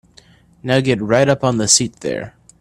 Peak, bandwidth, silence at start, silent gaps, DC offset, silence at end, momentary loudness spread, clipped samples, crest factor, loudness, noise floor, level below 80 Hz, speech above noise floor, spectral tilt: 0 dBFS; 13.5 kHz; 0.65 s; none; under 0.1%; 0.3 s; 15 LU; under 0.1%; 18 dB; -16 LUFS; -49 dBFS; -50 dBFS; 33 dB; -3.5 dB/octave